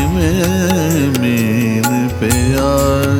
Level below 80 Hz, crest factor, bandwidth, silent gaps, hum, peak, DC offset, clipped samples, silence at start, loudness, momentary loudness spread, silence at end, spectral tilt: -26 dBFS; 12 dB; 19.5 kHz; none; none; -2 dBFS; under 0.1%; under 0.1%; 0 s; -14 LUFS; 1 LU; 0 s; -5.5 dB/octave